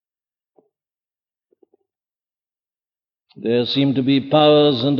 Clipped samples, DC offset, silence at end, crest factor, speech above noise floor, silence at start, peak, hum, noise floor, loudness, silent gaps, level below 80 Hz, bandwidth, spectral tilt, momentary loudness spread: under 0.1%; under 0.1%; 0 s; 18 dB; over 74 dB; 3.4 s; -2 dBFS; none; under -90 dBFS; -16 LUFS; none; -68 dBFS; 6 kHz; -8.5 dB/octave; 8 LU